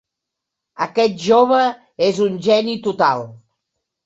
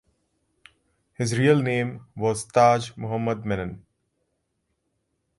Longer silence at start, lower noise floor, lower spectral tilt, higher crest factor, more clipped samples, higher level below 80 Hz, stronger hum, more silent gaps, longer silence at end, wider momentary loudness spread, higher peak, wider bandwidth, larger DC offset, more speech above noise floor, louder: second, 0.8 s vs 1.2 s; first, -81 dBFS vs -76 dBFS; about the same, -5 dB/octave vs -6 dB/octave; about the same, 16 dB vs 20 dB; neither; second, -62 dBFS vs -56 dBFS; neither; neither; second, 0.7 s vs 1.6 s; about the same, 10 LU vs 11 LU; about the same, -2 dBFS vs -4 dBFS; second, 8 kHz vs 11.5 kHz; neither; first, 65 dB vs 53 dB; first, -17 LUFS vs -23 LUFS